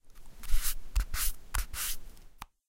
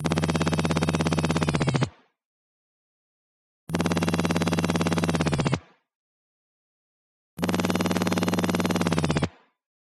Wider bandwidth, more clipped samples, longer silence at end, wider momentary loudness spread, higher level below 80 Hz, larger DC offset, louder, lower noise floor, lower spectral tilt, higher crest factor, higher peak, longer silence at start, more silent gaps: first, 16.5 kHz vs 14 kHz; neither; second, 0.25 s vs 0.6 s; first, 16 LU vs 4 LU; first, -34 dBFS vs -48 dBFS; neither; second, -35 LUFS vs -25 LUFS; second, -50 dBFS vs under -90 dBFS; second, -1 dB/octave vs -5.5 dB/octave; about the same, 18 dB vs 20 dB; second, -12 dBFS vs -6 dBFS; about the same, 0.05 s vs 0 s; second, none vs 2.25-3.67 s, 5.95-7.37 s